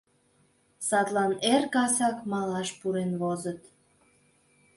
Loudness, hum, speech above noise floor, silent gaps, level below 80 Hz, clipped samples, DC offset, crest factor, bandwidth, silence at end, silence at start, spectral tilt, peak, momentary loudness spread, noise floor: -28 LUFS; none; 39 dB; none; -72 dBFS; under 0.1%; under 0.1%; 18 dB; 12 kHz; 1.2 s; 0.8 s; -4 dB/octave; -12 dBFS; 10 LU; -67 dBFS